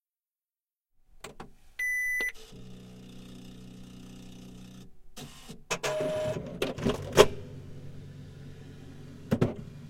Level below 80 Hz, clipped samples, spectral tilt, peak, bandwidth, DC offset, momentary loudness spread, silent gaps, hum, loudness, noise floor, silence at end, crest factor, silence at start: -52 dBFS; under 0.1%; -4.5 dB/octave; -2 dBFS; 16.5 kHz; under 0.1%; 21 LU; none; none; -29 LUFS; under -90 dBFS; 0 s; 32 dB; 1.15 s